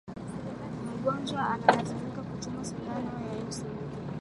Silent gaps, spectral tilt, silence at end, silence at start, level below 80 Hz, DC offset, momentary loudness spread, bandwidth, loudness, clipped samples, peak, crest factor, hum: none; -5.5 dB/octave; 0 s; 0.05 s; -56 dBFS; under 0.1%; 13 LU; 11.5 kHz; -33 LUFS; under 0.1%; -4 dBFS; 28 dB; none